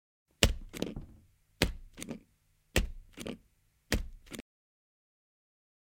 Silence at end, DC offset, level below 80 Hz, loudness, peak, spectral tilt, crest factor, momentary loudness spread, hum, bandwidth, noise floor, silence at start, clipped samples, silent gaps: 1.6 s; under 0.1%; -42 dBFS; -35 LUFS; -4 dBFS; -3.5 dB/octave; 34 dB; 18 LU; none; 16.5 kHz; -71 dBFS; 0.4 s; under 0.1%; none